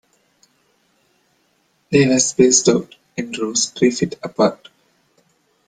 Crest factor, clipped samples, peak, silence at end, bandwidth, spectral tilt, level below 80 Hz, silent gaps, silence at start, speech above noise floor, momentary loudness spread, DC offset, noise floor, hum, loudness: 20 dB; under 0.1%; 0 dBFS; 1.15 s; 10 kHz; -3.5 dB/octave; -58 dBFS; none; 1.9 s; 46 dB; 13 LU; under 0.1%; -63 dBFS; none; -17 LUFS